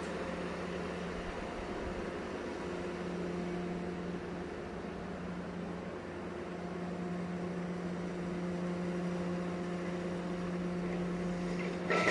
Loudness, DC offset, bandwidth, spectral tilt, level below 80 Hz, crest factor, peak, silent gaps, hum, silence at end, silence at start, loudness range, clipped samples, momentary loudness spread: -39 LUFS; under 0.1%; 11 kHz; -6.5 dB/octave; -56 dBFS; 22 dB; -16 dBFS; none; none; 0 s; 0 s; 4 LU; under 0.1%; 5 LU